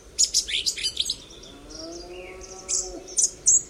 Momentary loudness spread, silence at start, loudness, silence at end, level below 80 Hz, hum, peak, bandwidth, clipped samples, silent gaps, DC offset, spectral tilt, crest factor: 20 LU; 0.05 s; -23 LUFS; 0 s; -50 dBFS; none; -4 dBFS; 16 kHz; under 0.1%; none; under 0.1%; 1 dB/octave; 22 dB